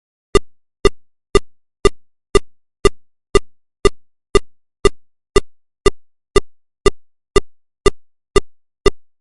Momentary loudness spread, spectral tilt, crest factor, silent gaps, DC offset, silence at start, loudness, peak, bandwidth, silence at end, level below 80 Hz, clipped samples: 0 LU; -4.5 dB/octave; 18 dB; none; under 0.1%; 0.35 s; -19 LUFS; 0 dBFS; 11.5 kHz; 0.2 s; -26 dBFS; under 0.1%